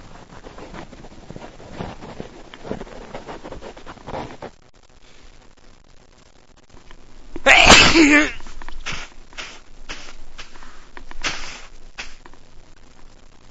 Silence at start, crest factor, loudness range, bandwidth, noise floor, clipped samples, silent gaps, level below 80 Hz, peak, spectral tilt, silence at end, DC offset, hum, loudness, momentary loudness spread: 0 s; 22 dB; 23 LU; 11 kHz; -48 dBFS; under 0.1%; none; -34 dBFS; 0 dBFS; -2.5 dB/octave; 0 s; under 0.1%; none; -13 LUFS; 29 LU